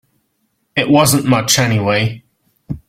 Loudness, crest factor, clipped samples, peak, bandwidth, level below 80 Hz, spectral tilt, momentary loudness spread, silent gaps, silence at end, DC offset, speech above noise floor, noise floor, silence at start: -14 LUFS; 16 dB; under 0.1%; 0 dBFS; 16.5 kHz; -46 dBFS; -4 dB/octave; 12 LU; none; 0.1 s; under 0.1%; 53 dB; -66 dBFS; 0.75 s